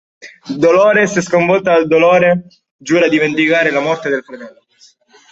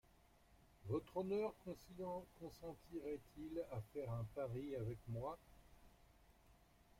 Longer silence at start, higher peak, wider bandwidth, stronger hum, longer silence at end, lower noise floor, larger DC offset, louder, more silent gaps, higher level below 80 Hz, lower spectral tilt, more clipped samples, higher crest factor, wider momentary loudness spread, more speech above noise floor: second, 0.25 s vs 0.4 s; first, 0 dBFS vs -32 dBFS; second, 8 kHz vs 16.5 kHz; neither; first, 0.8 s vs 0.35 s; second, -49 dBFS vs -71 dBFS; neither; first, -12 LUFS vs -49 LUFS; first, 2.71-2.79 s vs none; first, -58 dBFS vs -68 dBFS; second, -5 dB/octave vs -8 dB/octave; neither; second, 12 dB vs 18 dB; about the same, 11 LU vs 11 LU; first, 37 dB vs 24 dB